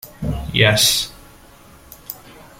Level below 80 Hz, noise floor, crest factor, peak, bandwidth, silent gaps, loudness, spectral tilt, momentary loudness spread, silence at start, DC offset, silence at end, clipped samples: -38 dBFS; -45 dBFS; 20 dB; -2 dBFS; 16.5 kHz; none; -16 LUFS; -2.5 dB/octave; 22 LU; 0.05 s; under 0.1%; 0.15 s; under 0.1%